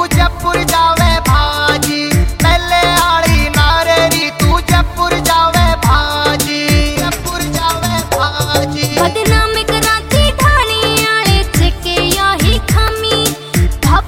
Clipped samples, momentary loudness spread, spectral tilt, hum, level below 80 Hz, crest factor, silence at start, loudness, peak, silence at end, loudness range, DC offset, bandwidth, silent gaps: under 0.1%; 4 LU; -4 dB/octave; none; -18 dBFS; 12 dB; 0 s; -12 LUFS; 0 dBFS; 0 s; 3 LU; under 0.1%; 16.5 kHz; none